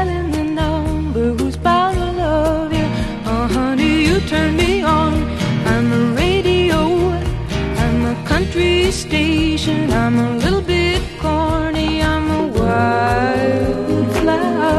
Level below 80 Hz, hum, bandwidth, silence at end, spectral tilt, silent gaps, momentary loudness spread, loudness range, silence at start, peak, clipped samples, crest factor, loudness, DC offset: -26 dBFS; none; 13 kHz; 0 s; -6 dB/octave; none; 5 LU; 1 LU; 0 s; 0 dBFS; under 0.1%; 14 dB; -16 LUFS; under 0.1%